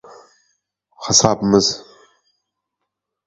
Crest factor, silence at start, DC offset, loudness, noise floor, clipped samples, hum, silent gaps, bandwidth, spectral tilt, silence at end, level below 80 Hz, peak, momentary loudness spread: 22 dB; 1 s; under 0.1%; -15 LUFS; -79 dBFS; under 0.1%; none; none; 8.4 kHz; -3.5 dB/octave; 1.45 s; -50 dBFS; 0 dBFS; 17 LU